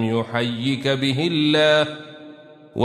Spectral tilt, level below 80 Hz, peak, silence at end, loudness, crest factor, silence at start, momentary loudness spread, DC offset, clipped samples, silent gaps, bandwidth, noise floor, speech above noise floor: -5.5 dB/octave; -60 dBFS; -4 dBFS; 0 s; -20 LUFS; 16 dB; 0 s; 17 LU; under 0.1%; under 0.1%; none; 13 kHz; -43 dBFS; 24 dB